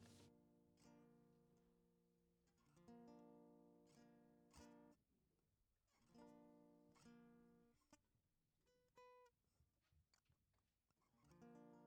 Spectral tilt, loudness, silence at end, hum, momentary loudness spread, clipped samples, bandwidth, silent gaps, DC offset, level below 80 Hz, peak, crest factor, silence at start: -5.5 dB/octave; -68 LUFS; 0 s; none; 3 LU; under 0.1%; 9.4 kHz; none; under 0.1%; -90 dBFS; -52 dBFS; 22 dB; 0 s